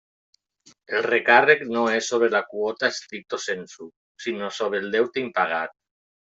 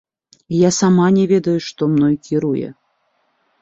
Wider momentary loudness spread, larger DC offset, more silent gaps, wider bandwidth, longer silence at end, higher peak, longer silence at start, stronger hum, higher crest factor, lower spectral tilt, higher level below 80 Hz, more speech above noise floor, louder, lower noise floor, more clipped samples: first, 16 LU vs 9 LU; neither; first, 3.96-4.15 s vs none; about the same, 8 kHz vs 7.8 kHz; second, 0.65 s vs 0.9 s; about the same, -4 dBFS vs -2 dBFS; first, 0.9 s vs 0.5 s; neither; first, 22 dB vs 14 dB; second, -3 dB/octave vs -6 dB/octave; second, -74 dBFS vs -56 dBFS; second, 35 dB vs 50 dB; second, -23 LUFS vs -16 LUFS; second, -58 dBFS vs -65 dBFS; neither